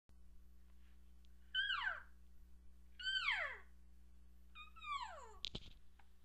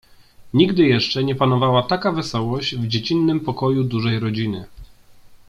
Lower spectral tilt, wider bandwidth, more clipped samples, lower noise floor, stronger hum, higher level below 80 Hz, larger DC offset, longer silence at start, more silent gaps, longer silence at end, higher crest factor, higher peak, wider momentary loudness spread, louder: second, -1.5 dB/octave vs -7 dB/octave; first, 15 kHz vs 11 kHz; neither; first, -65 dBFS vs -45 dBFS; first, 60 Hz at -65 dBFS vs none; second, -64 dBFS vs -50 dBFS; neither; second, 0.1 s vs 0.4 s; neither; about the same, 0.05 s vs 0.1 s; first, 24 dB vs 18 dB; second, -24 dBFS vs -2 dBFS; first, 23 LU vs 7 LU; second, -43 LUFS vs -19 LUFS